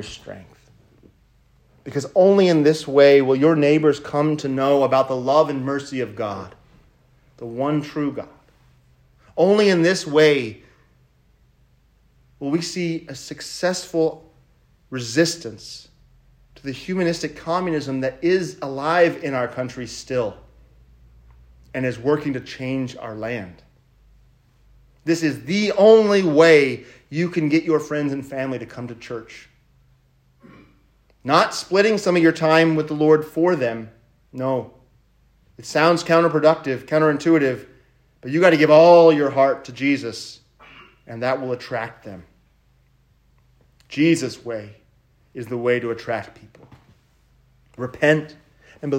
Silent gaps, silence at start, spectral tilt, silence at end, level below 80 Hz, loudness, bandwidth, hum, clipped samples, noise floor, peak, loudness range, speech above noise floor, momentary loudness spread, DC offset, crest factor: none; 0 s; -5.5 dB/octave; 0 s; -58 dBFS; -19 LUFS; 16 kHz; none; under 0.1%; -59 dBFS; 0 dBFS; 12 LU; 40 dB; 19 LU; under 0.1%; 20 dB